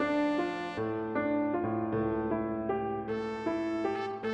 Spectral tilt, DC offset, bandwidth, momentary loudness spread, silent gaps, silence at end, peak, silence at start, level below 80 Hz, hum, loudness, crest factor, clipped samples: -7.5 dB/octave; under 0.1%; 8.8 kHz; 4 LU; none; 0 s; -18 dBFS; 0 s; -58 dBFS; none; -32 LUFS; 14 dB; under 0.1%